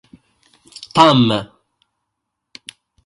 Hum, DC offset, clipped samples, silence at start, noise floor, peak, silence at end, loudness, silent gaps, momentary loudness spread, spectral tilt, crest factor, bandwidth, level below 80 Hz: none; under 0.1%; under 0.1%; 0.8 s; -77 dBFS; 0 dBFS; 1.6 s; -14 LUFS; none; 26 LU; -6 dB/octave; 20 dB; 11.5 kHz; -56 dBFS